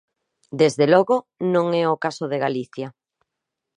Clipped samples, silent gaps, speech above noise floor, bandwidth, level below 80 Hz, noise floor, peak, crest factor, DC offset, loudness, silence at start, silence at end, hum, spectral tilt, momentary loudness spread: under 0.1%; none; 63 dB; 10.5 kHz; -72 dBFS; -83 dBFS; -2 dBFS; 20 dB; under 0.1%; -20 LUFS; 0.5 s; 0.85 s; none; -6 dB/octave; 17 LU